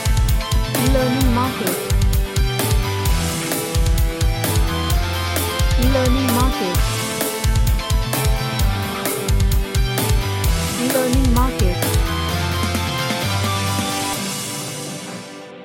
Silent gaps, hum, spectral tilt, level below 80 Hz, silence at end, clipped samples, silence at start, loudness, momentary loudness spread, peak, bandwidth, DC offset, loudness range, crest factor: none; none; -4.5 dB/octave; -22 dBFS; 0 s; under 0.1%; 0 s; -19 LUFS; 4 LU; -4 dBFS; 17 kHz; under 0.1%; 1 LU; 14 dB